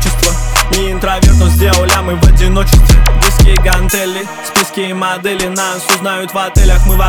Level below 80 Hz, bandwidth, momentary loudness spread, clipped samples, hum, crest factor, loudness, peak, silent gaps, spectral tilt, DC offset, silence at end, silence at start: -10 dBFS; 19.5 kHz; 7 LU; under 0.1%; none; 8 dB; -11 LUFS; 0 dBFS; none; -4 dB/octave; under 0.1%; 0 s; 0 s